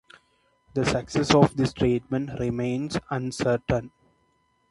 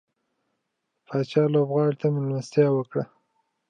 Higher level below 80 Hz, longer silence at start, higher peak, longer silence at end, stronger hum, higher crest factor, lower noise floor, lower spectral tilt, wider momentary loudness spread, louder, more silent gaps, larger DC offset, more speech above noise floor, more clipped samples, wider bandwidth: first, -48 dBFS vs -76 dBFS; second, 0.75 s vs 1.1 s; first, -2 dBFS vs -8 dBFS; first, 0.8 s vs 0.65 s; neither; first, 24 dB vs 18 dB; second, -68 dBFS vs -79 dBFS; second, -6 dB/octave vs -8 dB/octave; about the same, 10 LU vs 9 LU; about the same, -25 LUFS vs -24 LUFS; neither; neither; second, 44 dB vs 56 dB; neither; first, 11.5 kHz vs 9.2 kHz